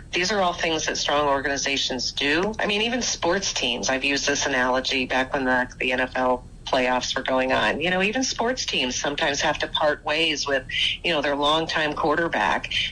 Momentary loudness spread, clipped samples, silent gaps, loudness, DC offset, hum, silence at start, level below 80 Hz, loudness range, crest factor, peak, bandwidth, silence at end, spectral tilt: 2 LU; under 0.1%; none; -22 LUFS; under 0.1%; none; 0 s; -46 dBFS; 1 LU; 12 dB; -12 dBFS; 10.5 kHz; 0 s; -2.5 dB/octave